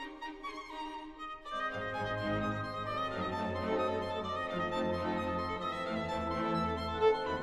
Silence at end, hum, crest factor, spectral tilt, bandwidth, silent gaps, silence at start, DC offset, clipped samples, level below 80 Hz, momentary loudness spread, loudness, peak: 0 s; none; 18 dB; -6.5 dB/octave; 12.5 kHz; none; 0 s; under 0.1%; under 0.1%; -56 dBFS; 11 LU; -36 LUFS; -18 dBFS